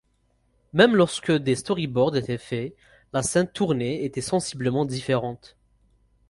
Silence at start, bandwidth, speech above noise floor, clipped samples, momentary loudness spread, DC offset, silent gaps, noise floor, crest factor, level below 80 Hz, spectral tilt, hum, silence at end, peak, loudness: 0.75 s; 11.5 kHz; 44 dB; under 0.1%; 12 LU; under 0.1%; none; -67 dBFS; 20 dB; -56 dBFS; -5 dB/octave; none; 0.95 s; -4 dBFS; -24 LUFS